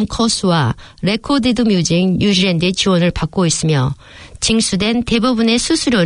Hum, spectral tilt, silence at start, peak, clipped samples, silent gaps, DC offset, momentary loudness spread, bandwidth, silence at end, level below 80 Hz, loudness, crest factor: none; -4.5 dB/octave; 0 s; -2 dBFS; under 0.1%; none; under 0.1%; 6 LU; 11 kHz; 0 s; -36 dBFS; -15 LUFS; 14 dB